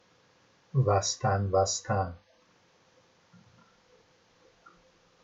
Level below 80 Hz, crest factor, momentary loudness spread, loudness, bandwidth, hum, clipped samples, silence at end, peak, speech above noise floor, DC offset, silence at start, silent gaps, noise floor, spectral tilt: -68 dBFS; 20 dB; 8 LU; -28 LUFS; 8.2 kHz; none; under 0.1%; 3.1 s; -12 dBFS; 37 dB; under 0.1%; 0.75 s; none; -65 dBFS; -4.5 dB/octave